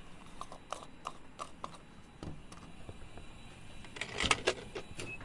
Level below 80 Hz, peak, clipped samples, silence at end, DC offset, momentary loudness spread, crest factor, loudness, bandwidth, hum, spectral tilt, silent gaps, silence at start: -56 dBFS; -10 dBFS; under 0.1%; 0 s; under 0.1%; 21 LU; 30 dB; -39 LUFS; 11.5 kHz; none; -2.5 dB/octave; none; 0 s